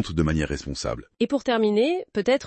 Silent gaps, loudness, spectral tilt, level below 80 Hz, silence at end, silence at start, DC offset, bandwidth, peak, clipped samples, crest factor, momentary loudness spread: none; -24 LUFS; -6 dB/octave; -42 dBFS; 0 s; 0 s; under 0.1%; 8.8 kHz; -10 dBFS; under 0.1%; 14 dB; 9 LU